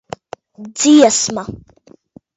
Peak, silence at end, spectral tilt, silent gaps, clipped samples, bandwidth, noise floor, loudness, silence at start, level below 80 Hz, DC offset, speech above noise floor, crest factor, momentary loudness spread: 0 dBFS; 0.8 s; -3 dB/octave; none; under 0.1%; 8 kHz; -45 dBFS; -12 LUFS; 0.6 s; -52 dBFS; under 0.1%; 32 dB; 16 dB; 23 LU